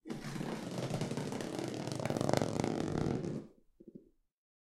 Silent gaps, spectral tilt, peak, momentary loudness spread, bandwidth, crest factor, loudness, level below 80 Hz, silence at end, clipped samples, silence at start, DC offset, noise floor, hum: none; -6 dB/octave; -12 dBFS; 16 LU; 15.5 kHz; 28 dB; -38 LUFS; -60 dBFS; 0.65 s; under 0.1%; 0.05 s; under 0.1%; -60 dBFS; none